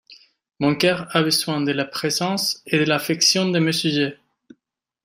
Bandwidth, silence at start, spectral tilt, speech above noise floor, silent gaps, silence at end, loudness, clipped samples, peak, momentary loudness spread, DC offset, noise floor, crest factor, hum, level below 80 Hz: 16 kHz; 0.1 s; -3.5 dB/octave; 57 dB; none; 0.9 s; -20 LUFS; under 0.1%; -4 dBFS; 6 LU; under 0.1%; -77 dBFS; 18 dB; none; -64 dBFS